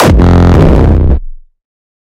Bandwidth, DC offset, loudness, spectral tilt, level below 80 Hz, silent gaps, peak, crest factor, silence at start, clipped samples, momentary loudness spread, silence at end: 14 kHz; under 0.1%; -7 LUFS; -7.5 dB/octave; -12 dBFS; none; 0 dBFS; 6 dB; 0 s; 2%; 7 LU; 0.8 s